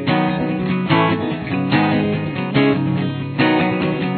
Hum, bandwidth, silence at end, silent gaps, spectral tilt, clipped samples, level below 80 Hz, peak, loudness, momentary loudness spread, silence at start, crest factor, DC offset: none; 4.6 kHz; 0 s; none; -10.5 dB/octave; under 0.1%; -48 dBFS; -2 dBFS; -18 LUFS; 5 LU; 0 s; 16 dB; under 0.1%